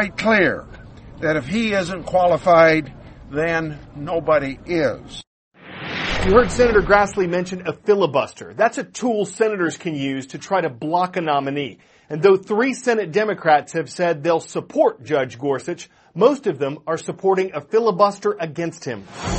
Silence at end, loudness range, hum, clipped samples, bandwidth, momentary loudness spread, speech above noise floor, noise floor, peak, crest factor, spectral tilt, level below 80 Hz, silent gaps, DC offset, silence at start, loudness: 0 s; 3 LU; none; under 0.1%; 8.8 kHz; 13 LU; 20 dB; -39 dBFS; 0 dBFS; 20 dB; -5.5 dB/octave; -42 dBFS; 5.27-5.51 s; under 0.1%; 0 s; -19 LUFS